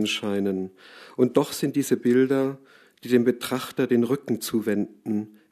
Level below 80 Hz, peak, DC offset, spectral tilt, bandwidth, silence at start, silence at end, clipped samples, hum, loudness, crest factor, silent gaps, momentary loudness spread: -70 dBFS; -6 dBFS; under 0.1%; -5.5 dB/octave; 14 kHz; 0 s; 0.25 s; under 0.1%; none; -24 LUFS; 20 dB; none; 10 LU